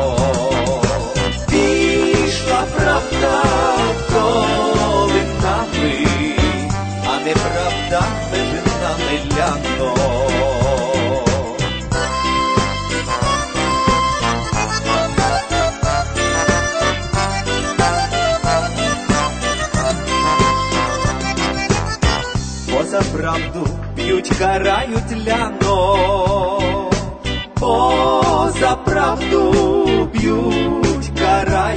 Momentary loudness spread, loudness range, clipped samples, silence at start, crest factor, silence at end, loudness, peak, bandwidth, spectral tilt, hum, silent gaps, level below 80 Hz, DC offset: 5 LU; 3 LU; under 0.1%; 0 s; 14 dB; 0 s; -17 LUFS; -2 dBFS; 9.2 kHz; -4.5 dB/octave; none; none; -28 dBFS; under 0.1%